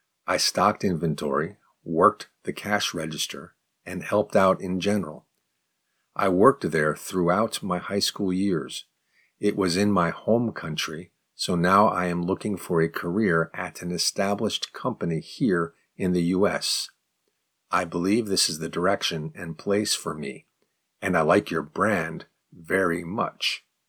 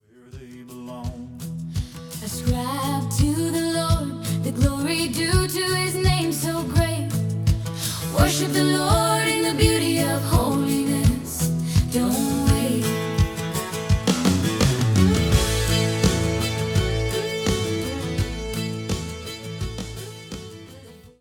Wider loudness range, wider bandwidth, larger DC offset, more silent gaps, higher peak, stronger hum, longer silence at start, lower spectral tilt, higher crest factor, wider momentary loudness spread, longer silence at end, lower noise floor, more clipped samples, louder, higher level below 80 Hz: second, 2 LU vs 6 LU; about the same, 19.5 kHz vs 18 kHz; neither; neither; about the same, -2 dBFS vs -4 dBFS; neither; about the same, 0.25 s vs 0.35 s; about the same, -4.5 dB/octave vs -5 dB/octave; about the same, 22 dB vs 18 dB; about the same, 12 LU vs 14 LU; first, 0.3 s vs 0.15 s; first, -76 dBFS vs -44 dBFS; neither; second, -25 LUFS vs -22 LUFS; second, -60 dBFS vs -34 dBFS